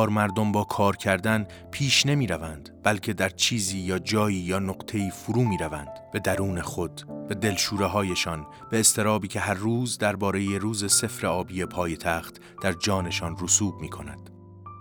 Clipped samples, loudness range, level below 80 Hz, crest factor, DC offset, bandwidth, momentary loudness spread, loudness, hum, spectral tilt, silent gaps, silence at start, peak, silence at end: under 0.1%; 4 LU; -54 dBFS; 22 dB; under 0.1%; over 20 kHz; 12 LU; -25 LUFS; none; -3.5 dB/octave; none; 0 s; -4 dBFS; 0 s